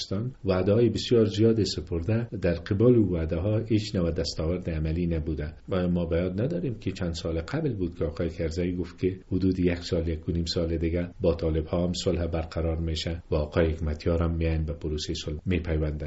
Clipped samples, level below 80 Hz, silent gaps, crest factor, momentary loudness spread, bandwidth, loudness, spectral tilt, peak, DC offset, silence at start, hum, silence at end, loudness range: under 0.1%; -38 dBFS; none; 18 dB; 8 LU; 8 kHz; -27 LUFS; -7 dB/octave; -8 dBFS; under 0.1%; 0 s; none; 0 s; 5 LU